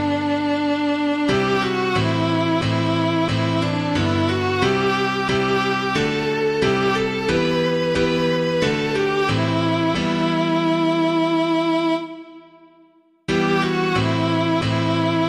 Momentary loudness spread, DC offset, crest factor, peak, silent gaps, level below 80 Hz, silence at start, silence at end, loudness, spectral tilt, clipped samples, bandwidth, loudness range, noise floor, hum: 2 LU; under 0.1%; 14 dB; -4 dBFS; none; -46 dBFS; 0 s; 0 s; -20 LUFS; -6 dB/octave; under 0.1%; 12 kHz; 2 LU; -54 dBFS; none